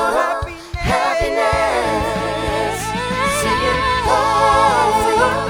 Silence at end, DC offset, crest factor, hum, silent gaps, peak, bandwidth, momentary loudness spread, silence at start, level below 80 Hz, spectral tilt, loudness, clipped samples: 0 s; under 0.1%; 16 dB; none; none; -2 dBFS; over 20 kHz; 7 LU; 0 s; -32 dBFS; -4 dB/octave; -17 LUFS; under 0.1%